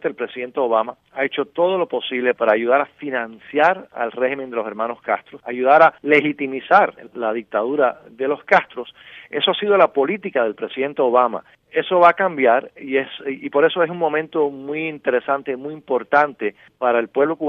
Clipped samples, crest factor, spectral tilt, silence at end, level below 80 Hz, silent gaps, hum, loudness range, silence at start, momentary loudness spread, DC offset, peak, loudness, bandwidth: under 0.1%; 18 dB; -6.5 dB/octave; 0 s; -70 dBFS; none; none; 3 LU; 0.05 s; 11 LU; under 0.1%; 0 dBFS; -19 LUFS; 6.6 kHz